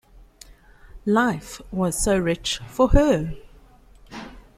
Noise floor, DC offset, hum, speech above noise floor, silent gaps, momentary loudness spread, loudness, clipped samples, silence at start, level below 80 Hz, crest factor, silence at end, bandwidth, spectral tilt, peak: -50 dBFS; under 0.1%; none; 29 dB; none; 21 LU; -22 LUFS; under 0.1%; 0.85 s; -32 dBFS; 22 dB; 0.15 s; 15 kHz; -5 dB/octave; -2 dBFS